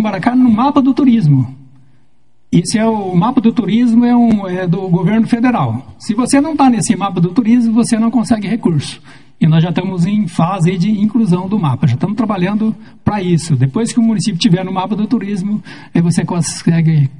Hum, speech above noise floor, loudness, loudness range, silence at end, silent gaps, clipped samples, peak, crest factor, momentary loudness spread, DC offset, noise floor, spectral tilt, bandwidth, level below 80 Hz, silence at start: none; 46 dB; -13 LUFS; 2 LU; 0.05 s; none; under 0.1%; 0 dBFS; 12 dB; 7 LU; 0.9%; -59 dBFS; -6.5 dB/octave; 11 kHz; -50 dBFS; 0 s